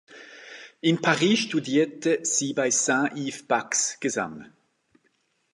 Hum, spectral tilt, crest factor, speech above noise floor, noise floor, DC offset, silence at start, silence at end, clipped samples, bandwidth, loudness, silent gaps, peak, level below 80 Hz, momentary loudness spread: none; -3 dB/octave; 22 dB; 45 dB; -70 dBFS; under 0.1%; 0.1 s; 1.1 s; under 0.1%; 11.5 kHz; -24 LUFS; none; -4 dBFS; -74 dBFS; 21 LU